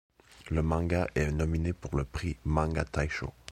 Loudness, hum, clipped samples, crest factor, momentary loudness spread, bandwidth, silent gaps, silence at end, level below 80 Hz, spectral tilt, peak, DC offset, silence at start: -31 LUFS; none; under 0.1%; 20 dB; 6 LU; 12 kHz; none; 0 s; -38 dBFS; -7 dB/octave; -10 dBFS; under 0.1%; 0.3 s